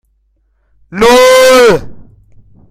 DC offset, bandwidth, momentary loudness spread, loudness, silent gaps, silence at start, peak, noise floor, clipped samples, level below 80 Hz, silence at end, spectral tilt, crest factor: under 0.1%; 16 kHz; 11 LU; -6 LUFS; none; 0.9 s; 0 dBFS; -56 dBFS; 0.4%; -36 dBFS; 0.7 s; -3 dB/octave; 10 dB